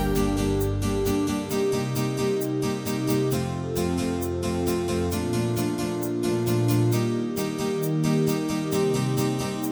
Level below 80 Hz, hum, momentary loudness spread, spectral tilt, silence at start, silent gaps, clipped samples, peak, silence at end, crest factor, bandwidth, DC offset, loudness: -42 dBFS; none; 4 LU; -6 dB/octave; 0 s; none; under 0.1%; -10 dBFS; 0 s; 14 dB; over 20 kHz; under 0.1%; -25 LUFS